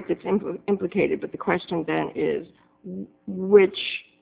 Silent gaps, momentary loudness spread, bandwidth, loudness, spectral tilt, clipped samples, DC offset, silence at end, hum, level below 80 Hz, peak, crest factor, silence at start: none; 18 LU; 4 kHz; -24 LUFS; -10 dB/octave; under 0.1%; under 0.1%; 0.2 s; none; -60 dBFS; -4 dBFS; 20 dB; 0 s